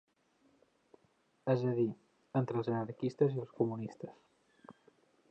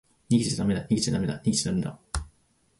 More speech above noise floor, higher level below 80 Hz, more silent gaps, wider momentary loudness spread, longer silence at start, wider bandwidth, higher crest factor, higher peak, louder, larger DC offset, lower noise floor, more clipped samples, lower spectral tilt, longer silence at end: about the same, 39 dB vs 40 dB; second, -80 dBFS vs -44 dBFS; neither; first, 13 LU vs 10 LU; first, 1.45 s vs 0.3 s; second, 8.2 kHz vs 11.5 kHz; about the same, 20 dB vs 18 dB; second, -18 dBFS vs -10 dBFS; second, -36 LUFS vs -27 LUFS; neither; first, -73 dBFS vs -66 dBFS; neither; first, -9.5 dB/octave vs -5 dB/octave; about the same, 0.6 s vs 0.5 s